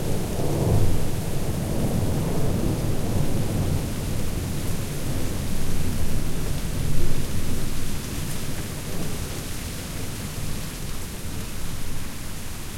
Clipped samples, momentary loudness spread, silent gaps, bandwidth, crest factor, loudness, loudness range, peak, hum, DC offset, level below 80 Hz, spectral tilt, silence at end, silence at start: under 0.1%; 8 LU; none; 16.5 kHz; 16 dB; -28 LUFS; 6 LU; -6 dBFS; none; under 0.1%; -30 dBFS; -5.5 dB/octave; 0 s; 0 s